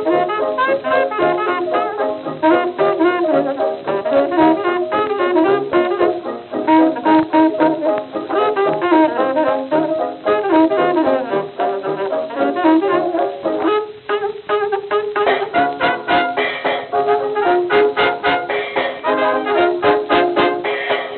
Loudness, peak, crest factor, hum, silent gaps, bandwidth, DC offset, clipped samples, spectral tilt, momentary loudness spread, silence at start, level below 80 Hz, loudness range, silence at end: -16 LUFS; 0 dBFS; 16 dB; none; none; 4.5 kHz; under 0.1%; under 0.1%; -9.5 dB/octave; 7 LU; 0 s; -58 dBFS; 2 LU; 0 s